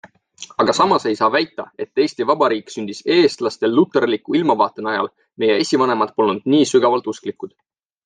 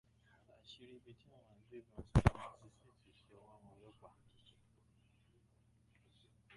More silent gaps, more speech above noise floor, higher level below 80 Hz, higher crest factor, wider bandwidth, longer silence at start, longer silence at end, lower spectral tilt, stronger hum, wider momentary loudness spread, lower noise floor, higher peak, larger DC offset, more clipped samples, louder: neither; second, 23 dB vs 30 dB; second, -66 dBFS vs -52 dBFS; second, 16 dB vs 30 dB; second, 9.8 kHz vs 11 kHz; second, 0.05 s vs 1.75 s; second, 0.6 s vs 4.1 s; second, -4.5 dB/octave vs -7.5 dB/octave; neither; second, 13 LU vs 30 LU; second, -41 dBFS vs -73 dBFS; first, -2 dBFS vs -16 dBFS; neither; neither; first, -18 LUFS vs -36 LUFS